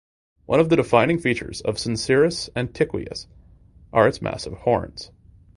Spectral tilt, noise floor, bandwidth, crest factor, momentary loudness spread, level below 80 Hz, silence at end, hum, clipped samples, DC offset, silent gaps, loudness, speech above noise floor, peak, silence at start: -5.5 dB/octave; -50 dBFS; 11.5 kHz; 22 dB; 15 LU; -46 dBFS; 0.5 s; none; under 0.1%; under 0.1%; none; -21 LUFS; 29 dB; -2 dBFS; 0.5 s